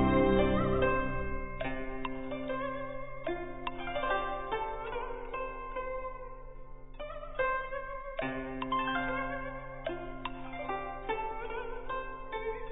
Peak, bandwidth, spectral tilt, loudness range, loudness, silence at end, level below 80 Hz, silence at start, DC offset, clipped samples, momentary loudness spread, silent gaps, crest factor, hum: -14 dBFS; 3.9 kHz; -2.5 dB/octave; 4 LU; -35 LUFS; 0 s; -46 dBFS; 0 s; under 0.1%; under 0.1%; 12 LU; none; 20 dB; none